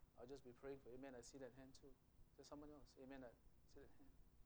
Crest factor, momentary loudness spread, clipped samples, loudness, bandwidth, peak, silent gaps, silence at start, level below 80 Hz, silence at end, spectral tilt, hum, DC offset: 16 dB; 10 LU; under 0.1%; -62 LUFS; over 20 kHz; -46 dBFS; none; 0 s; -74 dBFS; 0 s; -5 dB/octave; none; under 0.1%